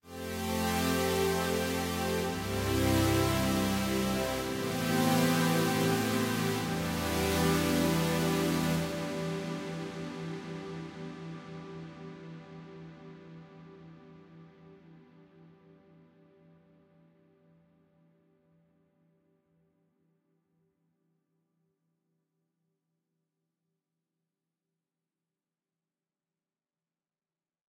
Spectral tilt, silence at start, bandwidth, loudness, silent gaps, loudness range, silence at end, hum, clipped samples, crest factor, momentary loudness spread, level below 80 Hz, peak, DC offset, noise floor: -5 dB/octave; 0.05 s; 16 kHz; -30 LUFS; none; 19 LU; 12.25 s; none; under 0.1%; 20 dB; 20 LU; -52 dBFS; -14 dBFS; under 0.1%; under -90 dBFS